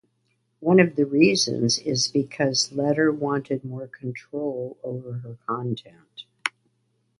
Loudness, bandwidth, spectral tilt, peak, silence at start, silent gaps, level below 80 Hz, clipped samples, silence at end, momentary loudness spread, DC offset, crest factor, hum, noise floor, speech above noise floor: -24 LUFS; 11.5 kHz; -4.5 dB/octave; -2 dBFS; 0.6 s; none; -66 dBFS; under 0.1%; 0.7 s; 16 LU; under 0.1%; 22 dB; none; -71 dBFS; 47 dB